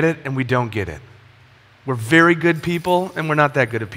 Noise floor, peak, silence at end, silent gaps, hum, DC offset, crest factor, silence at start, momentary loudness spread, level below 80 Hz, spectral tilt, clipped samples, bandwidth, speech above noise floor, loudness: -50 dBFS; 0 dBFS; 0 s; none; none; under 0.1%; 18 dB; 0 s; 14 LU; -50 dBFS; -6.5 dB/octave; under 0.1%; 16 kHz; 31 dB; -18 LUFS